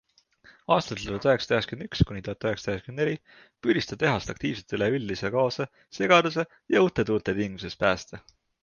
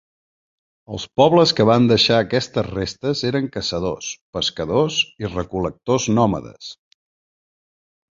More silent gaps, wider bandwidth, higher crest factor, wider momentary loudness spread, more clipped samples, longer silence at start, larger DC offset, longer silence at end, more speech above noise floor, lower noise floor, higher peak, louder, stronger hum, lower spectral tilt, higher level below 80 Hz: second, none vs 4.21-4.33 s; about the same, 7.2 kHz vs 7.8 kHz; about the same, 22 dB vs 20 dB; second, 10 LU vs 14 LU; neither; second, 0.7 s vs 0.9 s; neither; second, 0.45 s vs 1.4 s; second, 32 dB vs over 71 dB; second, -58 dBFS vs under -90 dBFS; about the same, -4 dBFS vs -2 dBFS; second, -26 LUFS vs -19 LUFS; neither; about the same, -5.5 dB/octave vs -5 dB/octave; about the same, -48 dBFS vs -46 dBFS